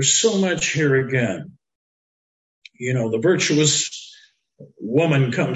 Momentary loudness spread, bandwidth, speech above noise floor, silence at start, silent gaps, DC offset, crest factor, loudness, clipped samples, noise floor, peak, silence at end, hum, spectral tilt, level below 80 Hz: 12 LU; 9 kHz; 32 dB; 0 s; 1.75-2.62 s; under 0.1%; 16 dB; -19 LUFS; under 0.1%; -52 dBFS; -4 dBFS; 0 s; none; -4 dB/octave; -58 dBFS